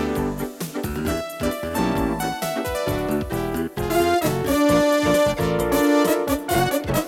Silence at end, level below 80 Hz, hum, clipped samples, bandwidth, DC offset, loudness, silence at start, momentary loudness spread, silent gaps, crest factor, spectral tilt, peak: 0 s; -38 dBFS; none; under 0.1%; 18.5 kHz; under 0.1%; -22 LUFS; 0 s; 8 LU; none; 14 dB; -5 dB/octave; -8 dBFS